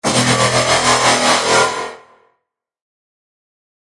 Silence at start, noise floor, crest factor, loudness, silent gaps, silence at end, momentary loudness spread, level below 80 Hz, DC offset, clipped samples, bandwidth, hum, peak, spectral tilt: 0.05 s; -73 dBFS; 16 dB; -13 LUFS; none; 2.05 s; 8 LU; -48 dBFS; under 0.1%; under 0.1%; 11.5 kHz; none; 0 dBFS; -2.5 dB/octave